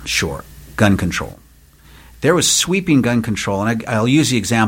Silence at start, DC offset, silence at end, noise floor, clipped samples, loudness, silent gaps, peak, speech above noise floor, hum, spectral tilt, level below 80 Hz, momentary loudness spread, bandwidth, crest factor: 0 s; under 0.1%; 0 s; -46 dBFS; under 0.1%; -16 LUFS; none; 0 dBFS; 30 dB; none; -4 dB/octave; -40 dBFS; 11 LU; 17 kHz; 18 dB